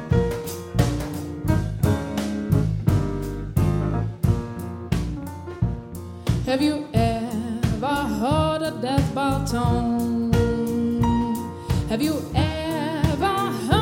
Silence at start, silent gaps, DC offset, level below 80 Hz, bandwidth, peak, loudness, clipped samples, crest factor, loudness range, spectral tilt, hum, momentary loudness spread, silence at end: 0 s; none; under 0.1%; -34 dBFS; 17 kHz; -4 dBFS; -24 LUFS; under 0.1%; 18 dB; 3 LU; -7 dB/octave; none; 7 LU; 0 s